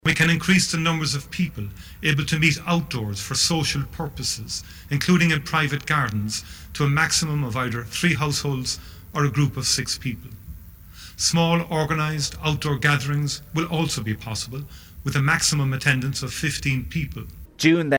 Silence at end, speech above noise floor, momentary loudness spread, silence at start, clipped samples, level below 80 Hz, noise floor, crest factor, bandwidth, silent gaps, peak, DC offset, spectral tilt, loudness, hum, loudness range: 0 s; 20 dB; 13 LU; 0.05 s; under 0.1%; -44 dBFS; -43 dBFS; 20 dB; 19 kHz; none; -4 dBFS; under 0.1%; -4 dB/octave; -22 LUFS; none; 2 LU